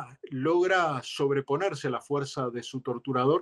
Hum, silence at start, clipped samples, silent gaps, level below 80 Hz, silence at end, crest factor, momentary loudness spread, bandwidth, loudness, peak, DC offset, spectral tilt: none; 0 s; under 0.1%; none; -74 dBFS; 0 s; 14 dB; 10 LU; 12 kHz; -29 LUFS; -14 dBFS; under 0.1%; -5.5 dB/octave